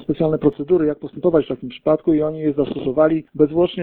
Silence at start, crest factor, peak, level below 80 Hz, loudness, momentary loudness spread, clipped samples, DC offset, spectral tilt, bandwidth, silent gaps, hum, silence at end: 0 s; 16 dB; -2 dBFS; -48 dBFS; -19 LUFS; 5 LU; under 0.1%; under 0.1%; -12 dB/octave; 4.2 kHz; none; none; 0 s